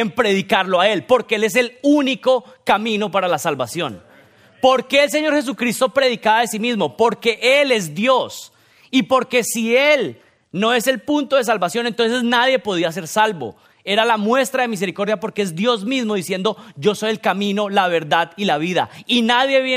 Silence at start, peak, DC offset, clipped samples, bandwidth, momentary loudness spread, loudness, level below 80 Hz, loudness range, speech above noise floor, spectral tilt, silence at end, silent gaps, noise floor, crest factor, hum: 0 s; -2 dBFS; under 0.1%; under 0.1%; 16 kHz; 7 LU; -18 LUFS; -64 dBFS; 2 LU; 31 dB; -4 dB/octave; 0 s; none; -49 dBFS; 16 dB; none